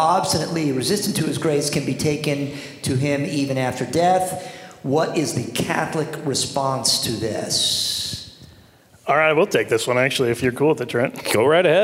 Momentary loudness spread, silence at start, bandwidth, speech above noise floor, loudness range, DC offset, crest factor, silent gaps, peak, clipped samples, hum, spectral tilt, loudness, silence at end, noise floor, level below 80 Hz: 8 LU; 0 s; 16 kHz; 30 dB; 2 LU; under 0.1%; 16 dB; none; -4 dBFS; under 0.1%; none; -4 dB/octave; -20 LUFS; 0 s; -50 dBFS; -54 dBFS